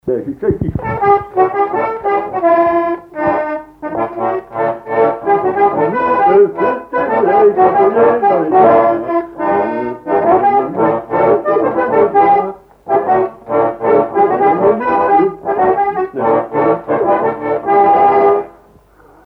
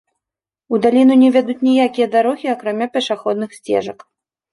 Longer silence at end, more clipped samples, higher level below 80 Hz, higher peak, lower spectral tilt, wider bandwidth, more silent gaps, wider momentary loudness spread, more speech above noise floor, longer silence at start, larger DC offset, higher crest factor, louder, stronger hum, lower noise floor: first, 0.75 s vs 0.6 s; neither; first, -44 dBFS vs -64 dBFS; about the same, 0 dBFS vs -2 dBFS; first, -9.5 dB/octave vs -5.5 dB/octave; second, 5.2 kHz vs 11.5 kHz; neither; about the same, 9 LU vs 10 LU; second, 31 dB vs 73 dB; second, 0.05 s vs 0.7 s; neither; about the same, 12 dB vs 14 dB; first, -13 LUFS vs -16 LUFS; neither; second, -45 dBFS vs -88 dBFS